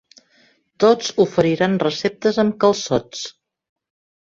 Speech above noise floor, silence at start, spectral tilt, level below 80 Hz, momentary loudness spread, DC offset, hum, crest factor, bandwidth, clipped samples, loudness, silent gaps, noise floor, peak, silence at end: 40 dB; 0.8 s; -5 dB/octave; -56 dBFS; 9 LU; under 0.1%; none; 18 dB; 7.8 kHz; under 0.1%; -18 LUFS; none; -58 dBFS; -2 dBFS; 1 s